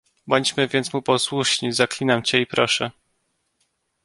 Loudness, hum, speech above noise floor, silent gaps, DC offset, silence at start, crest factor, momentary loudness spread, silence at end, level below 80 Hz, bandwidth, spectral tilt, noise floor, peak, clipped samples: -21 LUFS; none; 50 dB; none; under 0.1%; 0.25 s; 20 dB; 3 LU; 1.15 s; -62 dBFS; 11.5 kHz; -3.5 dB/octave; -71 dBFS; -2 dBFS; under 0.1%